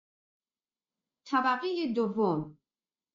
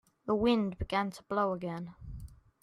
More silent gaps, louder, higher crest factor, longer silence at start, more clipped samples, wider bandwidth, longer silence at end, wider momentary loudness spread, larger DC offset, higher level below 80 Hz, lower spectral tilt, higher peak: neither; about the same, -30 LUFS vs -32 LUFS; about the same, 18 dB vs 18 dB; first, 1.25 s vs 0.25 s; neither; second, 7.4 kHz vs 12.5 kHz; first, 0.6 s vs 0.3 s; second, 6 LU vs 19 LU; neither; second, -80 dBFS vs -52 dBFS; second, -4 dB/octave vs -7 dB/octave; about the same, -16 dBFS vs -16 dBFS